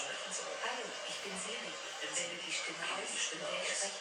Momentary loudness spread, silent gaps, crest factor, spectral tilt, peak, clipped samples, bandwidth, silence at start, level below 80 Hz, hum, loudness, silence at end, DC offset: 5 LU; none; 18 dB; 0 dB/octave; -22 dBFS; under 0.1%; 17.5 kHz; 0 s; -88 dBFS; none; -38 LUFS; 0 s; under 0.1%